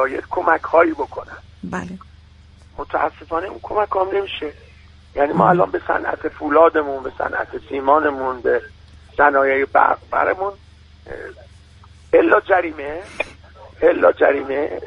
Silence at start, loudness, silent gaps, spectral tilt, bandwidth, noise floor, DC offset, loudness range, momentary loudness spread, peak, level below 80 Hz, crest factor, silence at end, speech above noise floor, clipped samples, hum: 0 s; -18 LUFS; none; -7 dB/octave; 10 kHz; -46 dBFS; under 0.1%; 6 LU; 17 LU; 0 dBFS; -46 dBFS; 18 dB; 0 s; 27 dB; under 0.1%; none